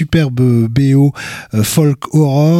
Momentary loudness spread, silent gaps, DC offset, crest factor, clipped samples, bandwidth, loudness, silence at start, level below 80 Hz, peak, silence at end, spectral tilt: 6 LU; none; under 0.1%; 10 dB; under 0.1%; 16 kHz; -12 LUFS; 0 s; -38 dBFS; -2 dBFS; 0 s; -6.5 dB/octave